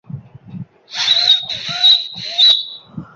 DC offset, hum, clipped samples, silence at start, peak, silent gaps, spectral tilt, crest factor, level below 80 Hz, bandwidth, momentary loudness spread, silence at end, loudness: under 0.1%; none; under 0.1%; 0.1 s; 0 dBFS; none; -1.5 dB/octave; 16 dB; -58 dBFS; 7.8 kHz; 17 LU; 0.1 s; -11 LUFS